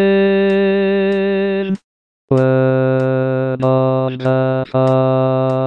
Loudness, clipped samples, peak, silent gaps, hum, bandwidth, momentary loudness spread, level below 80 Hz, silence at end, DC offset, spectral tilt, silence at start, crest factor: -15 LUFS; under 0.1%; -2 dBFS; 1.84-2.28 s; none; 5.6 kHz; 5 LU; -58 dBFS; 0 s; 0.3%; -9.5 dB/octave; 0 s; 12 dB